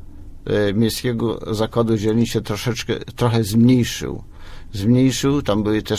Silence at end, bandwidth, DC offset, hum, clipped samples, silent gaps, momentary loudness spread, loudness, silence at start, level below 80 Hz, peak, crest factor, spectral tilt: 0 s; 16 kHz; under 0.1%; none; under 0.1%; none; 10 LU; -19 LUFS; 0 s; -40 dBFS; -4 dBFS; 14 dB; -6 dB/octave